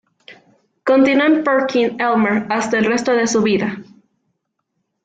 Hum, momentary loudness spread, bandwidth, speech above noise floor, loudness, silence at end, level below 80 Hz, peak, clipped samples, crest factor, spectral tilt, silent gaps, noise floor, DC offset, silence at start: none; 7 LU; 9.2 kHz; 57 dB; -16 LUFS; 1.2 s; -60 dBFS; -4 dBFS; under 0.1%; 14 dB; -4.5 dB/octave; none; -73 dBFS; under 0.1%; 0.3 s